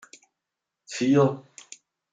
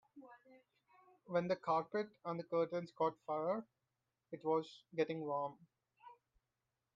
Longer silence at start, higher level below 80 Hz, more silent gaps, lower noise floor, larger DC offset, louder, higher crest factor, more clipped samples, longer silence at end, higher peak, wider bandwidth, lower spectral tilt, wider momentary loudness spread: first, 0.9 s vs 0.15 s; first, -72 dBFS vs -88 dBFS; neither; about the same, -86 dBFS vs -89 dBFS; neither; first, -23 LUFS vs -41 LUFS; about the same, 18 dB vs 18 dB; neither; about the same, 0.75 s vs 0.8 s; first, -8 dBFS vs -24 dBFS; first, 9.4 kHz vs 7.6 kHz; about the same, -6.5 dB/octave vs -7.5 dB/octave; first, 24 LU vs 9 LU